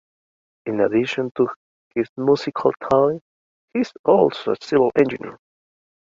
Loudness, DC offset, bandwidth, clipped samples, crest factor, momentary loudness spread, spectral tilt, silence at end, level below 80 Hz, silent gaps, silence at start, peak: -20 LUFS; under 0.1%; 7.6 kHz; under 0.1%; 18 dB; 12 LU; -7 dB/octave; 0.65 s; -60 dBFS; 1.31-1.35 s, 1.56-1.91 s, 2.09-2.16 s, 3.21-3.68 s, 3.99-4.04 s; 0.65 s; -2 dBFS